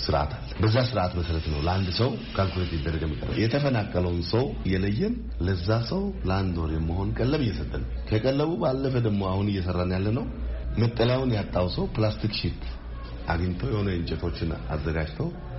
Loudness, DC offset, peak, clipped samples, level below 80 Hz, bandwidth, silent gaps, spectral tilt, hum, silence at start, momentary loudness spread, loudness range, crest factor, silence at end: -27 LUFS; under 0.1%; -10 dBFS; under 0.1%; -36 dBFS; 6 kHz; none; -6 dB/octave; none; 0 s; 7 LU; 2 LU; 16 dB; 0 s